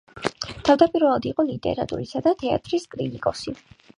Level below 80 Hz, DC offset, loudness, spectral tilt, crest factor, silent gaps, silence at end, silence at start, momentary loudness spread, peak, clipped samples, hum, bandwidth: -52 dBFS; under 0.1%; -23 LUFS; -6 dB/octave; 20 dB; none; 0.45 s; 0.15 s; 13 LU; -2 dBFS; under 0.1%; none; 11 kHz